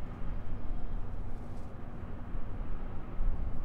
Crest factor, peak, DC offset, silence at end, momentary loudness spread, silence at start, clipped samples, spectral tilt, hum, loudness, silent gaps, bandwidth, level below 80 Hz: 12 dB; -18 dBFS; under 0.1%; 0 s; 6 LU; 0 s; under 0.1%; -9 dB/octave; none; -43 LUFS; none; 3.3 kHz; -36 dBFS